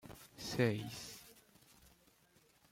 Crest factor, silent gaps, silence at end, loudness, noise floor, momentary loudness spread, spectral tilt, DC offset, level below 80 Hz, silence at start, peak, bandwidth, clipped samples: 24 dB; none; 0.85 s; -40 LUFS; -71 dBFS; 23 LU; -5 dB/octave; under 0.1%; -70 dBFS; 0.05 s; -20 dBFS; 16.5 kHz; under 0.1%